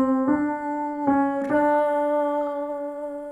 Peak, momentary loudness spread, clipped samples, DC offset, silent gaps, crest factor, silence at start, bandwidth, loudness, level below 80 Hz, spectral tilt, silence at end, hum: -10 dBFS; 9 LU; under 0.1%; under 0.1%; none; 14 dB; 0 s; 10.5 kHz; -24 LUFS; -60 dBFS; -7.5 dB/octave; 0 s; none